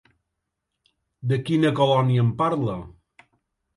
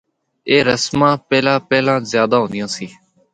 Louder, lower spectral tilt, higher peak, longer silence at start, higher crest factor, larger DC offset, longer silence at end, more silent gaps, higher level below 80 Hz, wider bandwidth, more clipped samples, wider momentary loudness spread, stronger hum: second, -22 LUFS vs -16 LUFS; first, -8 dB/octave vs -4.5 dB/octave; second, -6 dBFS vs 0 dBFS; first, 1.25 s vs 0.45 s; about the same, 18 dB vs 16 dB; neither; first, 0.9 s vs 0.45 s; neither; about the same, -56 dBFS vs -54 dBFS; first, 11.5 kHz vs 9.4 kHz; neither; about the same, 11 LU vs 11 LU; neither